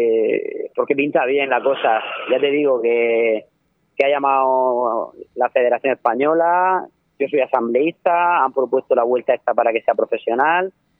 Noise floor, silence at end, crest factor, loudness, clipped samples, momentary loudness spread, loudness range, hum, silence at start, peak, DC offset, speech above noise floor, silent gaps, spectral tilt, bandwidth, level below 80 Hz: -57 dBFS; 0.3 s; 16 dB; -18 LUFS; under 0.1%; 6 LU; 1 LU; none; 0 s; -2 dBFS; under 0.1%; 40 dB; none; -7.5 dB/octave; 3.9 kHz; -74 dBFS